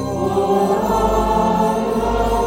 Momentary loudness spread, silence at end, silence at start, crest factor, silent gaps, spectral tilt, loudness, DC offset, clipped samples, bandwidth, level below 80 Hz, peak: 2 LU; 0 s; 0 s; 14 dB; none; -6.5 dB/octave; -17 LUFS; under 0.1%; under 0.1%; 16.5 kHz; -30 dBFS; -4 dBFS